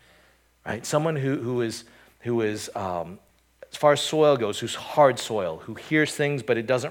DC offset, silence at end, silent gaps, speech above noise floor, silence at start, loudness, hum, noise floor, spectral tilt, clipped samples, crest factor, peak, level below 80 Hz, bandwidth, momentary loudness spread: under 0.1%; 0 s; none; 36 dB; 0.65 s; -24 LUFS; none; -60 dBFS; -5 dB/octave; under 0.1%; 20 dB; -6 dBFS; -64 dBFS; 17.5 kHz; 15 LU